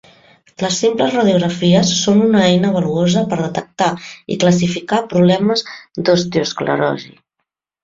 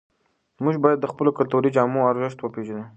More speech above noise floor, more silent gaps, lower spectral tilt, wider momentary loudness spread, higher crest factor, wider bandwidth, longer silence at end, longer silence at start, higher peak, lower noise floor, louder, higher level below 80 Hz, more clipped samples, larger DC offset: first, 61 dB vs 46 dB; neither; second, -5 dB/octave vs -8.5 dB/octave; about the same, 8 LU vs 10 LU; second, 14 dB vs 20 dB; about the same, 7.8 kHz vs 8.4 kHz; first, 0.75 s vs 0.05 s; about the same, 0.6 s vs 0.6 s; about the same, -2 dBFS vs -2 dBFS; first, -76 dBFS vs -67 dBFS; first, -15 LUFS vs -22 LUFS; first, -52 dBFS vs -68 dBFS; neither; neither